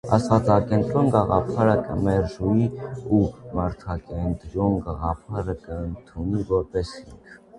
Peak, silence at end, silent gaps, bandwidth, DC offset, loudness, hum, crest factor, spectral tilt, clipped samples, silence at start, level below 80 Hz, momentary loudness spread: -2 dBFS; 0 s; none; 11 kHz; under 0.1%; -24 LUFS; none; 22 dB; -8.5 dB/octave; under 0.1%; 0.05 s; -38 dBFS; 12 LU